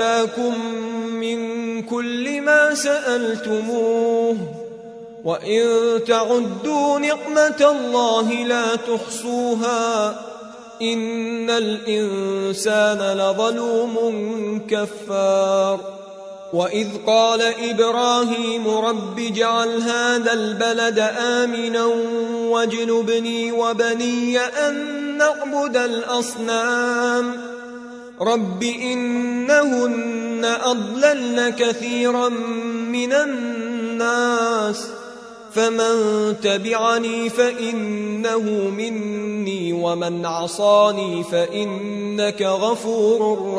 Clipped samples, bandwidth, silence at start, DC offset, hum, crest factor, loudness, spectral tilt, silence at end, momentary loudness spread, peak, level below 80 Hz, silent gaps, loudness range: under 0.1%; 11 kHz; 0 s; under 0.1%; none; 18 dB; -20 LUFS; -3.5 dB/octave; 0 s; 8 LU; -2 dBFS; -68 dBFS; none; 3 LU